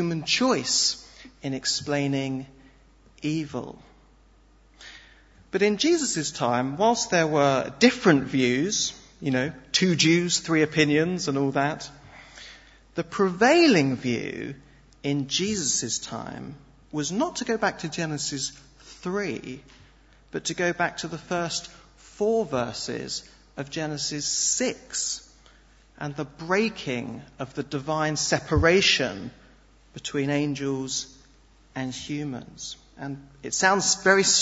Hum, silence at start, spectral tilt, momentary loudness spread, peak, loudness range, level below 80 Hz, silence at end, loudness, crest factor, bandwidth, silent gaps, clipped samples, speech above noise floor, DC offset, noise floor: none; 0 s; -3.5 dB/octave; 18 LU; -4 dBFS; 8 LU; -52 dBFS; 0 s; -24 LUFS; 22 dB; 8.2 kHz; none; under 0.1%; 31 dB; under 0.1%; -56 dBFS